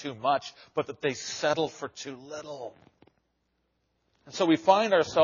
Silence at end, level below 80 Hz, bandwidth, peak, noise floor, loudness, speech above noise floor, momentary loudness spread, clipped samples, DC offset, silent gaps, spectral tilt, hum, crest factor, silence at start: 0 s; -72 dBFS; 7.2 kHz; -6 dBFS; -76 dBFS; -27 LUFS; 48 dB; 19 LU; under 0.1%; under 0.1%; none; -3 dB/octave; none; 22 dB; 0 s